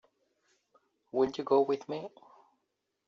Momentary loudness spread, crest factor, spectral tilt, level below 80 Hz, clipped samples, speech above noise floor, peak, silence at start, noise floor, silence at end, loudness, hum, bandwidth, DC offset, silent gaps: 13 LU; 20 dB; -5 dB/octave; -74 dBFS; under 0.1%; 52 dB; -14 dBFS; 1.15 s; -83 dBFS; 1 s; -31 LUFS; none; 7 kHz; under 0.1%; none